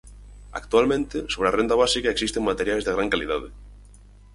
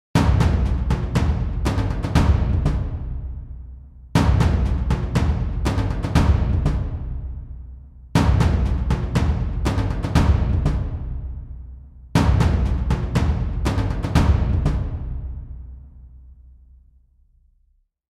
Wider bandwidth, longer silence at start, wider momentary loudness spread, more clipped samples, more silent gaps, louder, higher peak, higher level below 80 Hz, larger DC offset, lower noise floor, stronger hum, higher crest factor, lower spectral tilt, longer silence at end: about the same, 11.5 kHz vs 12.5 kHz; about the same, 0.05 s vs 0.15 s; second, 10 LU vs 17 LU; neither; neither; about the same, -23 LUFS vs -22 LUFS; about the same, -4 dBFS vs -4 dBFS; second, -42 dBFS vs -24 dBFS; neither; second, -48 dBFS vs -62 dBFS; first, 50 Hz at -40 dBFS vs none; about the same, 20 dB vs 18 dB; second, -3.5 dB/octave vs -7 dB/octave; second, 0.4 s vs 1.85 s